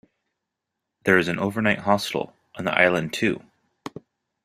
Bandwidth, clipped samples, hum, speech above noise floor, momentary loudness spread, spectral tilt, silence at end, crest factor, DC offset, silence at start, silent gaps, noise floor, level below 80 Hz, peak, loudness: 15.5 kHz; under 0.1%; none; 61 dB; 20 LU; -5 dB/octave; 0.55 s; 24 dB; under 0.1%; 1.05 s; none; -83 dBFS; -60 dBFS; -2 dBFS; -22 LUFS